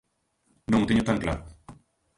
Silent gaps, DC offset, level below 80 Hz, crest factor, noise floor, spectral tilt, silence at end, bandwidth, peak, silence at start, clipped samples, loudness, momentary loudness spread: none; under 0.1%; -44 dBFS; 20 dB; -71 dBFS; -6.5 dB/octave; 0.45 s; 11.5 kHz; -8 dBFS; 0.7 s; under 0.1%; -26 LUFS; 13 LU